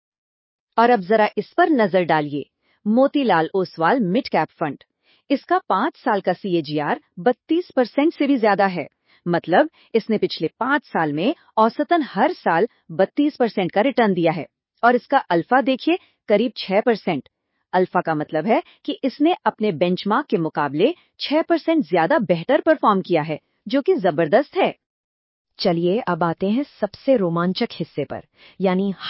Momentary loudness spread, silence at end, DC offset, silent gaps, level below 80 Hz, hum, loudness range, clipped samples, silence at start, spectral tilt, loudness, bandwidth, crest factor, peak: 8 LU; 0 s; under 0.1%; 24.86-25.45 s; -68 dBFS; none; 3 LU; under 0.1%; 0.75 s; -10.5 dB/octave; -20 LUFS; 5.8 kHz; 16 dB; -4 dBFS